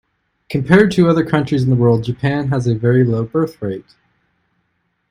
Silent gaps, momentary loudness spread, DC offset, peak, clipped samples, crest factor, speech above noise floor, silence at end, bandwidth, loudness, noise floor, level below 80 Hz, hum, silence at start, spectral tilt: none; 12 LU; under 0.1%; 0 dBFS; under 0.1%; 16 dB; 53 dB; 1.3 s; 11 kHz; -15 LUFS; -67 dBFS; -48 dBFS; none; 0.5 s; -8 dB/octave